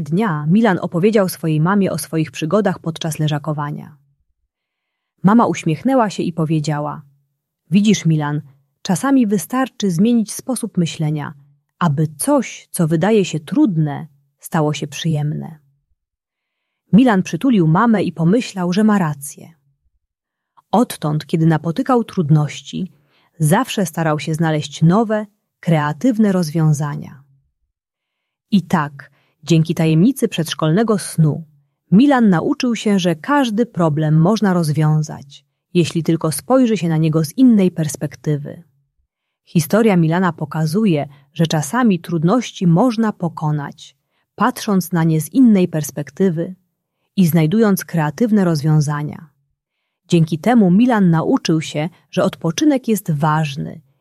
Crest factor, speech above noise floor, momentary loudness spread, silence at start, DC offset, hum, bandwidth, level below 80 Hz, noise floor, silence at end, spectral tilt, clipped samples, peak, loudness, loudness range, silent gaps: 16 dB; 65 dB; 10 LU; 0 s; under 0.1%; none; 14 kHz; -58 dBFS; -81 dBFS; 0.2 s; -6.5 dB/octave; under 0.1%; -2 dBFS; -17 LUFS; 4 LU; none